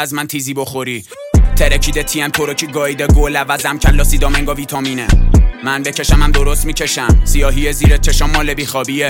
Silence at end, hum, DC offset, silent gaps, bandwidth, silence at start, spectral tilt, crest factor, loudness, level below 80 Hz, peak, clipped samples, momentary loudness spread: 0 s; none; under 0.1%; none; 17 kHz; 0 s; -4.5 dB/octave; 12 dB; -14 LUFS; -14 dBFS; 0 dBFS; under 0.1%; 7 LU